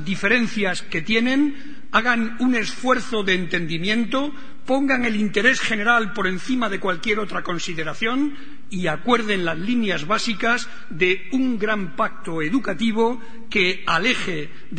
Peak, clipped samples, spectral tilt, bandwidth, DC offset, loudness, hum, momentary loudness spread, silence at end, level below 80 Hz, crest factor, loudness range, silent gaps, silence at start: -2 dBFS; under 0.1%; -4.5 dB/octave; 9.4 kHz; 5%; -21 LUFS; none; 8 LU; 0 s; -52 dBFS; 20 dB; 3 LU; none; 0 s